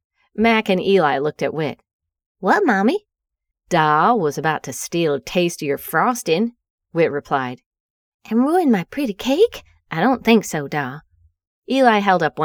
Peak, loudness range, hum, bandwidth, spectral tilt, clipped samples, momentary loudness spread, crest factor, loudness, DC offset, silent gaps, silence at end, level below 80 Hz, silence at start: 0 dBFS; 2 LU; none; over 20 kHz; -5 dB/octave; under 0.1%; 10 LU; 20 dB; -19 LUFS; under 0.1%; 1.93-2.00 s, 2.26-2.35 s, 6.70-6.78 s, 7.66-7.71 s, 7.80-8.19 s, 11.47-11.62 s; 0 s; -56 dBFS; 0.35 s